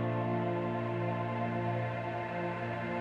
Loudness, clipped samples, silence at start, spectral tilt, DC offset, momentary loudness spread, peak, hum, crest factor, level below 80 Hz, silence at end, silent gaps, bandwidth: -35 LUFS; under 0.1%; 0 s; -9 dB/octave; under 0.1%; 3 LU; -22 dBFS; none; 12 dB; -66 dBFS; 0 s; none; 6 kHz